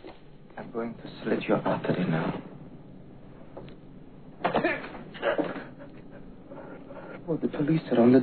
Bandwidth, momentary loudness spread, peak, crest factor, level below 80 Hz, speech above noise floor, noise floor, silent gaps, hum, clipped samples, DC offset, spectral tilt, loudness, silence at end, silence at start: 4.5 kHz; 22 LU; -8 dBFS; 22 dB; -56 dBFS; 23 dB; -49 dBFS; none; none; under 0.1%; 0.2%; -11 dB/octave; -29 LUFS; 0 s; 0 s